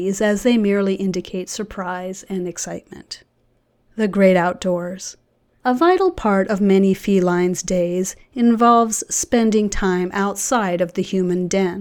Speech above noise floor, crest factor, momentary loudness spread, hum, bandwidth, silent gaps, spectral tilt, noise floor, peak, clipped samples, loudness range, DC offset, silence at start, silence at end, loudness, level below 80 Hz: 44 dB; 16 dB; 13 LU; none; 18 kHz; none; -5 dB/octave; -62 dBFS; -2 dBFS; under 0.1%; 6 LU; under 0.1%; 0 s; 0 s; -19 LUFS; -42 dBFS